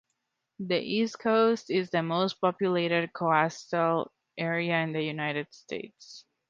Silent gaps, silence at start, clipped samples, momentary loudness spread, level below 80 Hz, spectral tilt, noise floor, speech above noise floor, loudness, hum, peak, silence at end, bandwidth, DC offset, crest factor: none; 0.6 s; under 0.1%; 14 LU; -74 dBFS; -6 dB/octave; -81 dBFS; 53 dB; -28 LUFS; none; -8 dBFS; 0.3 s; 7.6 kHz; under 0.1%; 20 dB